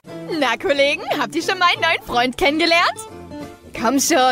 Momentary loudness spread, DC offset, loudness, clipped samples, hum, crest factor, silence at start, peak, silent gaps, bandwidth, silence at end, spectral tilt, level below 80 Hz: 18 LU; under 0.1%; -17 LUFS; under 0.1%; none; 14 dB; 0.05 s; -4 dBFS; none; 16 kHz; 0 s; -2 dB/octave; -48 dBFS